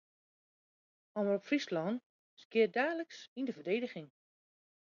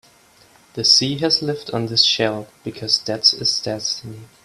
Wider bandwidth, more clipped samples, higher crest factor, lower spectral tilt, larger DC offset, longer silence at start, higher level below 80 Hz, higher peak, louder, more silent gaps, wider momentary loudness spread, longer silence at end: second, 7.4 kHz vs 14.5 kHz; neither; about the same, 20 dB vs 20 dB; about the same, -4 dB/octave vs -3 dB/octave; neither; first, 1.15 s vs 0.75 s; second, -88 dBFS vs -58 dBFS; second, -18 dBFS vs 0 dBFS; second, -36 LUFS vs -17 LUFS; first, 2.06-2.37 s, 2.45-2.50 s, 3.28-3.36 s vs none; second, 12 LU vs 16 LU; first, 0.8 s vs 0.2 s